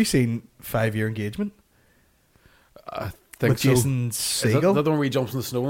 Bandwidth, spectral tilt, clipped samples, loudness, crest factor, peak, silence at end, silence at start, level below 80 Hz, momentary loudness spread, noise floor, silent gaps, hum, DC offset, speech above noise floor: 17 kHz; -5 dB/octave; under 0.1%; -24 LUFS; 16 dB; -8 dBFS; 0 s; 0 s; -50 dBFS; 14 LU; -61 dBFS; none; none; under 0.1%; 39 dB